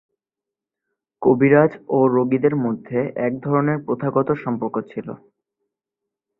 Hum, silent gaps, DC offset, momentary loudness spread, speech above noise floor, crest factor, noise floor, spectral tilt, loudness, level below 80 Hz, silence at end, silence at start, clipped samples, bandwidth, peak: none; none; under 0.1%; 11 LU; 68 dB; 20 dB; -87 dBFS; -12 dB/octave; -19 LUFS; -62 dBFS; 1.25 s; 1.2 s; under 0.1%; 4 kHz; -2 dBFS